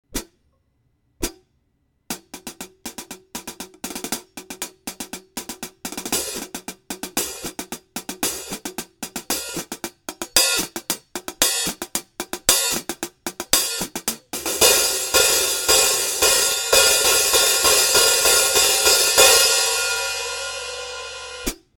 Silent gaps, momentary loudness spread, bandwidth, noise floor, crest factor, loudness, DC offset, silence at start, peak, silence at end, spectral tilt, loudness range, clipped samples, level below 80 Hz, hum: none; 20 LU; 19 kHz; -67 dBFS; 22 dB; -17 LUFS; under 0.1%; 0.15 s; 0 dBFS; 0.2 s; 0.5 dB/octave; 18 LU; under 0.1%; -46 dBFS; none